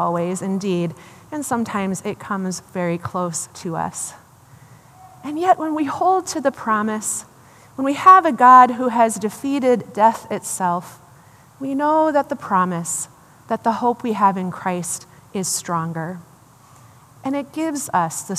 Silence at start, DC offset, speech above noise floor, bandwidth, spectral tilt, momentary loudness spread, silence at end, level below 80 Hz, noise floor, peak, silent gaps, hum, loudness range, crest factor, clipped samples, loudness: 0 s; under 0.1%; 29 dB; 15 kHz; -4.5 dB/octave; 14 LU; 0 s; -66 dBFS; -48 dBFS; 0 dBFS; none; none; 11 LU; 20 dB; under 0.1%; -19 LUFS